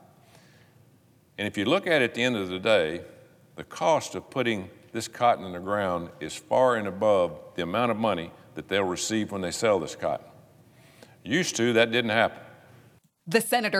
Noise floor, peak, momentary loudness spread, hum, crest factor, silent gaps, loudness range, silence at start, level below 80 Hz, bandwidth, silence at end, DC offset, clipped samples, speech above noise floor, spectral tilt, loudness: -60 dBFS; -6 dBFS; 14 LU; none; 20 dB; none; 2 LU; 1.4 s; -66 dBFS; 16 kHz; 0 s; under 0.1%; under 0.1%; 34 dB; -4 dB/octave; -26 LUFS